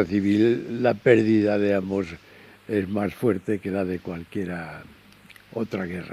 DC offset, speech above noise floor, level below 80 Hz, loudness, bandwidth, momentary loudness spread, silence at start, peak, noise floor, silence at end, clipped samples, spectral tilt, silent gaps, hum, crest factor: under 0.1%; 27 dB; -58 dBFS; -24 LUFS; 13.5 kHz; 15 LU; 0 s; -4 dBFS; -51 dBFS; 0 s; under 0.1%; -8 dB/octave; none; none; 20 dB